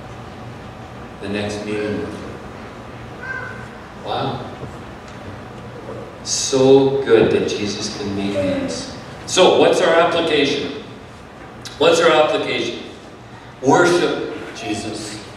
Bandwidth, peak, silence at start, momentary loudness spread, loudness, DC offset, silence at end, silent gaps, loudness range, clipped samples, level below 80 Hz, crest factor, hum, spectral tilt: 13 kHz; 0 dBFS; 0 s; 21 LU; -17 LUFS; under 0.1%; 0 s; none; 12 LU; under 0.1%; -48 dBFS; 18 dB; none; -4 dB/octave